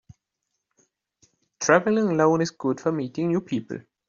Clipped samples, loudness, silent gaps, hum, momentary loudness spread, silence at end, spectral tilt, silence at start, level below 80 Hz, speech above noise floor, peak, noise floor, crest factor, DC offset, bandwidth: under 0.1%; -23 LUFS; none; none; 10 LU; 0.3 s; -5.5 dB/octave; 1.6 s; -66 dBFS; 58 dB; -4 dBFS; -81 dBFS; 22 dB; under 0.1%; 7.6 kHz